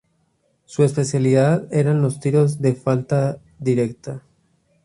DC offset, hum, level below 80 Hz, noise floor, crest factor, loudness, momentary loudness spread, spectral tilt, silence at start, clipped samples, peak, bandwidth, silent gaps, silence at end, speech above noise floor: under 0.1%; none; -58 dBFS; -65 dBFS; 16 dB; -19 LUFS; 11 LU; -7.5 dB/octave; 0.7 s; under 0.1%; -4 dBFS; 11.5 kHz; none; 0.65 s; 47 dB